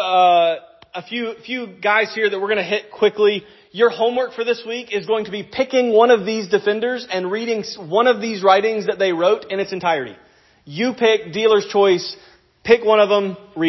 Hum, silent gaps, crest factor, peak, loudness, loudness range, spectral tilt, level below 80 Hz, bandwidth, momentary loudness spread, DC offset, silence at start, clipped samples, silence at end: none; none; 18 dB; 0 dBFS; -18 LUFS; 2 LU; -4.5 dB/octave; -62 dBFS; 6.2 kHz; 13 LU; under 0.1%; 0 s; under 0.1%; 0 s